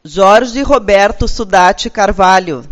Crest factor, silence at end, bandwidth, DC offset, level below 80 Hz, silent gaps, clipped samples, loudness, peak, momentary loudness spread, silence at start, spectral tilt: 10 dB; 0 s; 10.5 kHz; under 0.1%; -26 dBFS; none; 1%; -10 LUFS; 0 dBFS; 5 LU; 0.05 s; -4 dB/octave